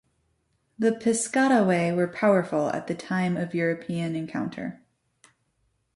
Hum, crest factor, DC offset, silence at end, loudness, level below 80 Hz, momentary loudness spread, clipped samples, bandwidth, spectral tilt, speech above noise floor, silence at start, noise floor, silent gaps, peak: none; 18 dB; under 0.1%; 1.2 s; -25 LUFS; -68 dBFS; 10 LU; under 0.1%; 11.5 kHz; -5.5 dB/octave; 47 dB; 0.8 s; -72 dBFS; none; -8 dBFS